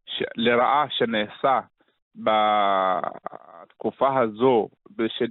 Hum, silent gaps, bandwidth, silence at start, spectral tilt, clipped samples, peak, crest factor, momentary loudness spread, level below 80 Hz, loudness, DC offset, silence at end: none; 2.02-2.11 s; 4.2 kHz; 0.1 s; -2.5 dB/octave; under 0.1%; -8 dBFS; 16 dB; 12 LU; -66 dBFS; -23 LUFS; under 0.1%; 0 s